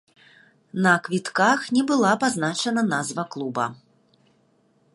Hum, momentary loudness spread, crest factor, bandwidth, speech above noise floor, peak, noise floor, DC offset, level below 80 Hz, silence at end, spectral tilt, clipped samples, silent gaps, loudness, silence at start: none; 9 LU; 20 dB; 11.5 kHz; 41 dB; -4 dBFS; -63 dBFS; under 0.1%; -70 dBFS; 1.2 s; -4.5 dB/octave; under 0.1%; none; -22 LUFS; 0.75 s